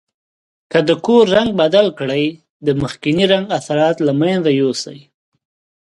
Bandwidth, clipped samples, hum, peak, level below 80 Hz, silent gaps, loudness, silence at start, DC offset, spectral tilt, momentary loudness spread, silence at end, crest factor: 11.5 kHz; under 0.1%; none; 0 dBFS; -52 dBFS; 2.50-2.60 s; -15 LUFS; 0.75 s; under 0.1%; -5.5 dB/octave; 7 LU; 0.9 s; 16 dB